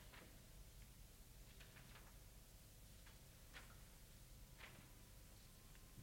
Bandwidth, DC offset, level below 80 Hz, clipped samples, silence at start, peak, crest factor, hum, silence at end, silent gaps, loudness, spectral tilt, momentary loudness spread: 16.5 kHz; under 0.1%; -66 dBFS; under 0.1%; 0 s; -44 dBFS; 18 dB; 50 Hz at -70 dBFS; 0 s; none; -63 LUFS; -3.5 dB/octave; 4 LU